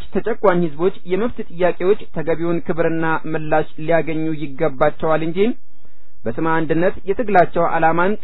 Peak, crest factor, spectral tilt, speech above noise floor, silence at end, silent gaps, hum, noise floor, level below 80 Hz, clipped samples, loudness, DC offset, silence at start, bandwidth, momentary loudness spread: 0 dBFS; 18 dB; -10.5 dB/octave; 36 dB; 0.05 s; none; none; -55 dBFS; -44 dBFS; under 0.1%; -19 LUFS; 10%; 0 s; 5.4 kHz; 7 LU